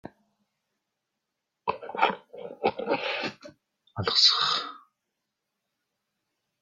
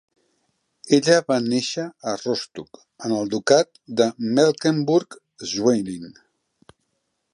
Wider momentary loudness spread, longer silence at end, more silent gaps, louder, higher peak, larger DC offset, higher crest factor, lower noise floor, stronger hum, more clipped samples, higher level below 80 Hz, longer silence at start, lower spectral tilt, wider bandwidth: first, 21 LU vs 16 LU; first, 1.85 s vs 1.2 s; neither; second, -25 LUFS vs -21 LUFS; second, -6 dBFS vs -2 dBFS; neither; about the same, 24 dB vs 20 dB; first, -84 dBFS vs -74 dBFS; neither; neither; about the same, -72 dBFS vs -68 dBFS; second, 0.05 s vs 0.85 s; second, -2.5 dB/octave vs -4.5 dB/octave; first, 13 kHz vs 11 kHz